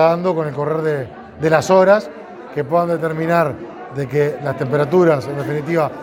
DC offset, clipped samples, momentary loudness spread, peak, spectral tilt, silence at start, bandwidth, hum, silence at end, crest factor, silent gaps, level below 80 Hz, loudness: under 0.1%; under 0.1%; 14 LU; 0 dBFS; -7 dB/octave; 0 s; 17 kHz; none; 0 s; 16 dB; none; -56 dBFS; -17 LUFS